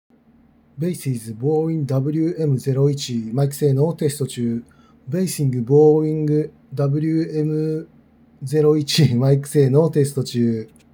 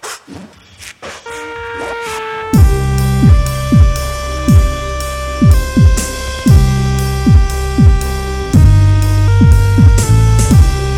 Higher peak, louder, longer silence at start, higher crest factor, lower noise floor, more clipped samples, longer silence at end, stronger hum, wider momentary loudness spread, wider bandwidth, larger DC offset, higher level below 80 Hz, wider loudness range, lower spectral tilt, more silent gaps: about the same, -2 dBFS vs 0 dBFS; second, -20 LUFS vs -11 LUFS; first, 0.75 s vs 0.05 s; first, 16 dB vs 10 dB; first, -54 dBFS vs -35 dBFS; second, under 0.1% vs 1%; first, 0.3 s vs 0 s; neither; second, 10 LU vs 15 LU; first, over 20 kHz vs 16.5 kHz; neither; second, -62 dBFS vs -14 dBFS; about the same, 3 LU vs 4 LU; about the same, -7 dB/octave vs -6.5 dB/octave; neither